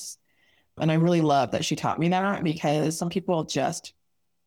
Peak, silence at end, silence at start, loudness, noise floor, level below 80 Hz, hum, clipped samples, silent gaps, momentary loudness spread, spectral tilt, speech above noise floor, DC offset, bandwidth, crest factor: -10 dBFS; 0.6 s; 0 s; -25 LUFS; -66 dBFS; -62 dBFS; none; under 0.1%; none; 7 LU; -5.5 dB/octave; 42 dB; under 0.1%; 15.5 kHz; 16 dB